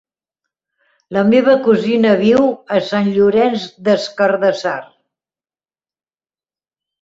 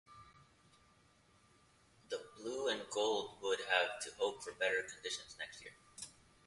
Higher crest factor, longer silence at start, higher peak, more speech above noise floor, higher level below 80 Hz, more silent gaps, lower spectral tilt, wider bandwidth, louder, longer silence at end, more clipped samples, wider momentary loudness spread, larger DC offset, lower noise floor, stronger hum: second, 14 dB vs 24 dB; first, 1.1 s vs 0.1 s; first, -2 dBFS vs -18 dBFS; first, over 76 dB vs 30 dB; first, -58 dBFS vs -76 dBFS; neither; first, -6.5 dB/octave vs -1.5 dB/octave; second, 7.8 kHz vs 11.5 kHz; first, -14 LUFS vs -39 LUFS; first, 2.15 s vs 0.35 s; neither; second, 9 LU vs 18 LU; neither; first, under -90 dBFS vs -70 dBFS; neither